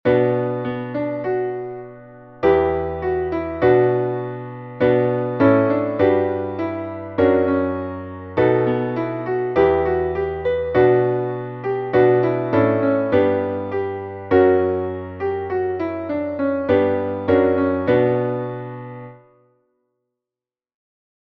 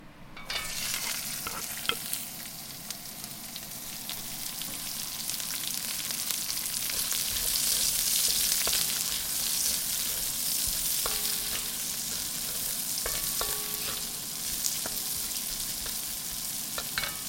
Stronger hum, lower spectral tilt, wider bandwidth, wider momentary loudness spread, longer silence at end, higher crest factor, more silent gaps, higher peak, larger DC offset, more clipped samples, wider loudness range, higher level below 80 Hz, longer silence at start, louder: neither; first, -10 dB/octave vs 0.5 dB/octave; second, 4.9 kHz vs 17 kHz; about the same, 11 LU vs 12 LU; first, 2.1 s vs 0 s; second, 16 dB vs 30 dB; neither; about the same, -4 dBFS vs -2 dBFS; neither; neither; second, 3 LU vs 9 LU; first, -48 dBFS vs -54 dBFS; about the same, 0.05 s vs 0 s; first, -19 LUFS vs -29 LUFS